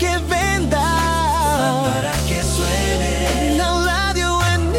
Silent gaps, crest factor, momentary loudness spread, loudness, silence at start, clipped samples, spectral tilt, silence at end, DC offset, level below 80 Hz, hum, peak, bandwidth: none; 12 dB; 2 LU; -18 LUFS; 0 s; under 0.1%; -4 dB/octave; 0 s; under 0.1%; -26 dBFS; none; -6 dBFS; 16.5 kHz